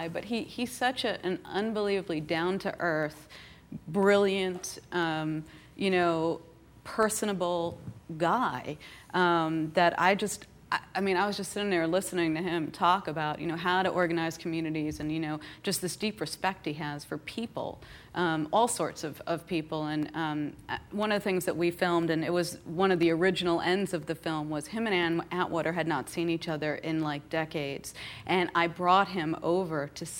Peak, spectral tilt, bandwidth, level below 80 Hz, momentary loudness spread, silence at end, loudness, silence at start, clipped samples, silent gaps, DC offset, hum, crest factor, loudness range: -8 dBFS; -4.5 dB/octave; 16.5 kHz; -62 dBFS; 11 LU; 0 s; -30 LUFS; 0 s; under 0.1%; none; under 0.1%; none; 22 dB; 4 LU